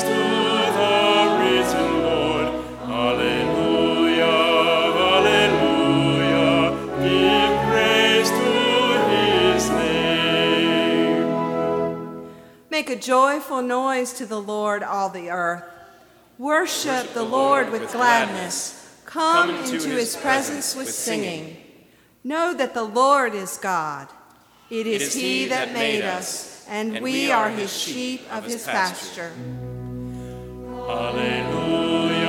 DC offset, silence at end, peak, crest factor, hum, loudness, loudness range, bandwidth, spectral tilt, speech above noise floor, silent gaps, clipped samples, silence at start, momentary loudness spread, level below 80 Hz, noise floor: under 0.1%; 0 s; -4 dBFS; 18 dB; none; -20 LUFS; 7 LU; 18.5 kHz; -3.5 dB/octave; 31 dB; none; under 0.1%; 0 s; 14 LU; -50 dBFS; -53 dBFS